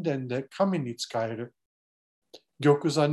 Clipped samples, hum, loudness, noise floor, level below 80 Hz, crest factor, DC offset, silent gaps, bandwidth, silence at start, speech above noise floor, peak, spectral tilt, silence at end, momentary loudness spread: under 0.1%; none; -28 LUFS; under -90 dBFS; -74 dBFS; 18 dB; under 0.1%; 1.66-2.22 s; 12.5 kHz; 0 s; over 63 dB; -10 dBFS; -6 dB/octave; 0 s; 11 LU